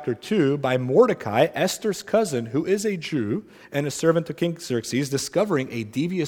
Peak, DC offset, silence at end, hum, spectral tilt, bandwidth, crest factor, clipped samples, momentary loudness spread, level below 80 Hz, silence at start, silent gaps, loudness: -4 dBFS; under 0.1%; 0 s; none; -5.5 dB/octave; 18 kHz; 18 dB; under 0.1%; 7 LU; -64 dBFS; 0 s; none; -23 LUFS